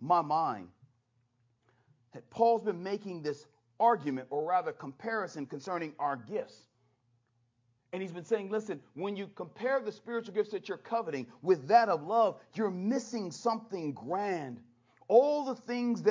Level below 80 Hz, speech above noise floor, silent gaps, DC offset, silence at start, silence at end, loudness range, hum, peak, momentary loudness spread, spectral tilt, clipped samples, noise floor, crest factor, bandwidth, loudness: -82 dBFS; 43 dB; none; under 0.1%; 0 s; 0 s; 8 LU; none; -12 dBFS; 14 LU; -6 dB/octave; under 0.1%; -75 dBFS; 22 dB; 7.6 kHz; -32 LUFS